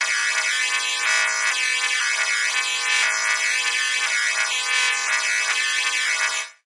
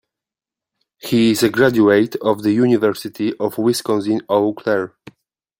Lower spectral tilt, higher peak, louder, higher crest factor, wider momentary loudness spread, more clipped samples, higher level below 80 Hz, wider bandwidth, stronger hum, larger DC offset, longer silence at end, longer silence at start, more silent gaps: second, 5.5 dB/octave vs -5.5 dB/octave; about the same, -4 dBFS vs -2 dBFS; about the same, -19 LUFS vs -17 LUFS; about the same, 18 dB vs 16 dB; second, 2 LU vs 8 LU; neither; second, under -90 dBFS vs -60 dBFS; second, 11.5 kHz vs 16.5 kHz; neither; neither; second, 0.15 s vs 0.7 s; second, 0 s vs 1.05 s; neither